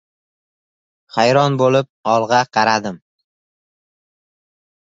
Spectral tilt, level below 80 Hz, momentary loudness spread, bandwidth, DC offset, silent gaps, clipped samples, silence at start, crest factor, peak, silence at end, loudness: -5 dB/octave; -62 dBFS; 7 LU; 7.8 kHz; under 0.1%; 1.89-2.03 s; under 0.1%; 1.15 s; 18 dB; -2 dBFS; 2 s; -16 LUFS